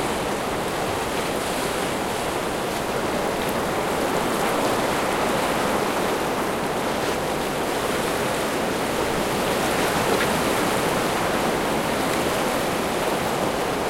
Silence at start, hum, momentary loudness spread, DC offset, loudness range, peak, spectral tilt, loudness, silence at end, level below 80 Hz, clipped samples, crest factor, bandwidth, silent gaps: 0 s; none; 3 LU; under 0.1%; 2 LU; -8 dBFS; -3.5 dB/octave; -23 LUFS; 0 s; -44 dBFS; under 0.1%; 16 dB; 16 kHz; none